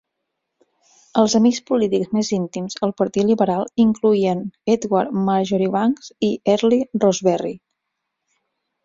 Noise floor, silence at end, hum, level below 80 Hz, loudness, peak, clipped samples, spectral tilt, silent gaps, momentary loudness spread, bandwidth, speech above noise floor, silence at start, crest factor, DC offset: -78 dBFS; 1.3 s; none; -60 dBFS; -19 LUFS; -2 dBFS; under 0.1%; -6 dB/octave; none; 7 LU; 7.6 kHz; 60 dB; 1.15 s; 18 dB; under 0.1%